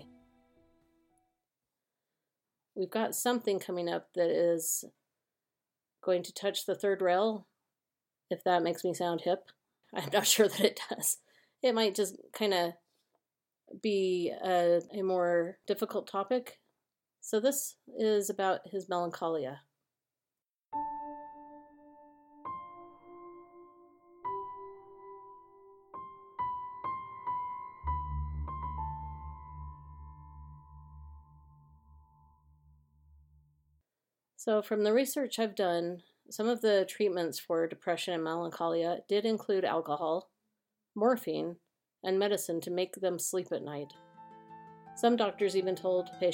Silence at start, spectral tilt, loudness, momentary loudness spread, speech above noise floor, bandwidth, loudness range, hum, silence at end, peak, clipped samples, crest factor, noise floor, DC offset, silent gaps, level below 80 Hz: 0 s; -3.5 dB/octave; -32 LUFS; 21 LU; over 59 dB; 16.5 kHz; 14 LU; none; 0 s; -10 dBFS; under 0.1%; 24 dB; under -90 dBFS; under 0.1%; none; -54 dBFS